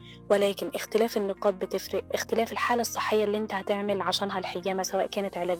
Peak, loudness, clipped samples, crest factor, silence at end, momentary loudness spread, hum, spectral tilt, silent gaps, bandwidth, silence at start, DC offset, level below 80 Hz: -10 dBFS; -28 LUFS; under 0.1%; 18 dB; 0 s; 5 LU; none; -3.5 dB/octave; none; over 20 kHz; 0 s; under 0.1%; -62 dBFS